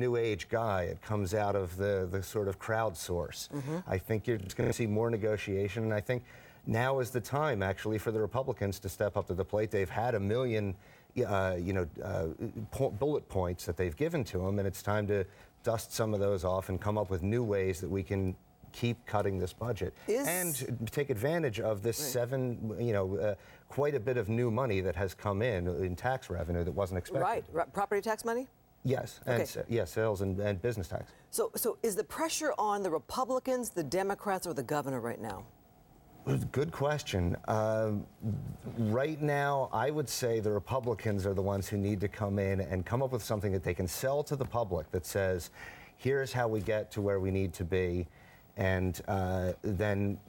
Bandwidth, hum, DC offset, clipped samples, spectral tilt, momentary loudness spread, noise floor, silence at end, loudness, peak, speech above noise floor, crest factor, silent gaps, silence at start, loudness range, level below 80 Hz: 18 kHz; none; under 0.1%; under 0.1%; -6 dB/octave; 6 LU; -60 dBFS; 0.05 s; -34 LUFS; -14 dBFS; 27 dB; 18 dB; none; 0 s; 2 LU; -56 dBFS